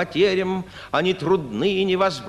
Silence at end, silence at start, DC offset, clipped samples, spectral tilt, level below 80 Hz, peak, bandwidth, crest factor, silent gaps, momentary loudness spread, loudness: 0 s; 0 s; under 0.1%; under 0.1%; -6 dB/octave; -52 dBFS; -6 dBFS; 11.5 kHz; 16 dB; none; 6 LU; -22 LUFS